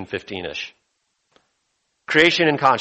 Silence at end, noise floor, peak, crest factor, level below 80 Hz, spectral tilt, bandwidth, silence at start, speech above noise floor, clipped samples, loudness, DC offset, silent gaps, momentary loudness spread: 0 s; -72 dBFS; -2 dBFS; 20 dB; -60 dBFS; -4.5 dB/octave; 8.4 kHz; 0 s; 53 dB; under 0.1%; -19 LUFS; under 0.1%; none; 16 LU